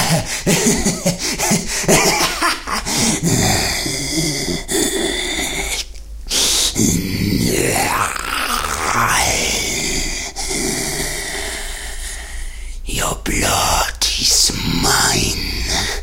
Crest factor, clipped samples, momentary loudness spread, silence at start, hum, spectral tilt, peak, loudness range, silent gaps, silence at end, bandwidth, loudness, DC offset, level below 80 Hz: 18 dB; under 0.1%; 10 LU; 0 s; none; -2.5 dB/octave; 0 dBFS; 5 LU; none; 0 s; 16.5 kHz; -16 LUFS; under 0.1%; -30 dBFS